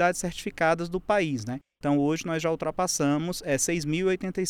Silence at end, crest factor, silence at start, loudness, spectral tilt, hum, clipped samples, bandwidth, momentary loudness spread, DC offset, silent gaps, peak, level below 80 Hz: 0 s; 16 dB; 0 s; -27 LUFS; -4.5 dB/octave; none; under 0.1%; 18 kHz; 6 LU; under 0.1%; none; -10 dBFS; -52 dBFS